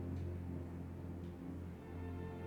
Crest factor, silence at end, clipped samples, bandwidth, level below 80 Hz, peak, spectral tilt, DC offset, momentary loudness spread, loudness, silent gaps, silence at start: 12 dB; 0 s; under 0.1%; 8.6 kHz; -58 dBFS; -34 dBFS; -9 dB/octave; under 0.1%; 4 LU; -47 LUFS; none; 0 s